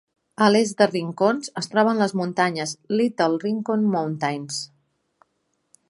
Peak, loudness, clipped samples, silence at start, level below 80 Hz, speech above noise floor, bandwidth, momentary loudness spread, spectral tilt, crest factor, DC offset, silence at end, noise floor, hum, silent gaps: -2 dBFS; -22 LUFS; under 0.1%; 0.4 s; -72 dBFS; 51 dB; 11.5 kHz; 10 LU; -5 dB/octave; 22 dB; under 0.1%; 1.25 s; -72 dBFS; none; none